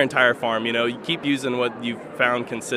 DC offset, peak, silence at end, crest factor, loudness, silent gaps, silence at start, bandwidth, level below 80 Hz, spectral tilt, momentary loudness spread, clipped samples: under 0.1%; -2 dBFS; 0 s; 20 dB; -22 LUFS; none; 0 s; 15 kHz; -66 dBFS; -4 dB/octave; 7 LU; under 0.1%